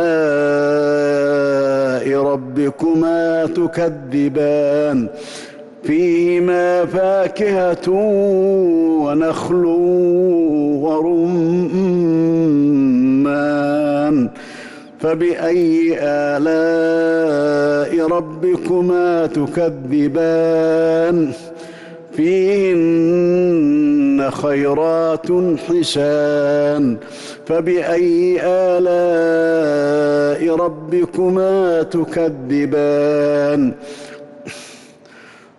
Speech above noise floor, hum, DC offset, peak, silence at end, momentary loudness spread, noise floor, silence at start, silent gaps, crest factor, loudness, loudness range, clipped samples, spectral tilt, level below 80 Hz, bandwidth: 27 dB; none; under 0.1%; -8 dBFS; 0.8 s; 6 LU; -42 dBFS; 0 s; none; 8 dB; -15 LUFS; 2 LU; under 0.1%; -7 dB/octave; -54 dBFS; 11.5 kHz